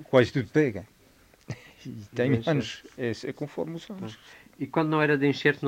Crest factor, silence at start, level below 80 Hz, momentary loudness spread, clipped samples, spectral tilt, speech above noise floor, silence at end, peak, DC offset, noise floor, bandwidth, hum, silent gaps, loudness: 22 dB; 0 s; -62 dBFS; 19 LU; under 0.1%; -6.5 dB/octave; 32 dB; 0 s; -6 dBFS; under 0.1%; -58 dBFS; 16 kHz; none; none; -27 LUFS